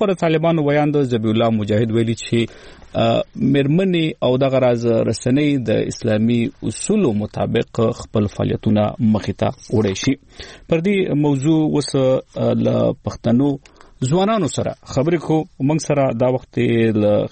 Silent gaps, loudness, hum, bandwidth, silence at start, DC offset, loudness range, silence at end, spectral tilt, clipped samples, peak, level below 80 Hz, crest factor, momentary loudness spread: none; -18 LUFS; none; 8.8 kHz; 0 s; under 0.1%; 2 LU; 0.05 s; -6.5 dB/octave; under 0.1%; -6 dBFS; -46 dBFS; 12 dB; 5 LU